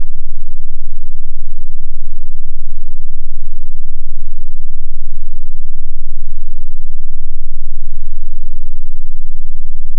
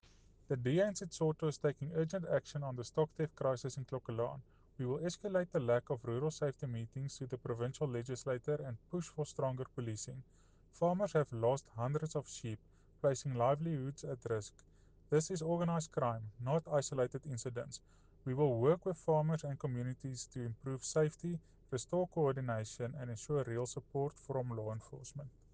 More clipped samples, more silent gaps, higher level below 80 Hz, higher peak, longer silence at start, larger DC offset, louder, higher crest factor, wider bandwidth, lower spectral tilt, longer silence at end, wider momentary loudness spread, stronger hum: neither; neither; first, -14 dBFS vs -66 dBFS; first, 0 dBFS vs -20 dBFS; second, 0 s vs 0.5 s; neither; first, -28 LUFS vs -39 LUFS; second, 4 dB vs 18 dB; second, 0.1 kHz vs 9.8 kHz; first, -14.5 dB/octave vs -6.5 dB/octave; second, 0 s vs 0.25 s; second, 1 LU vs 10 LU; neither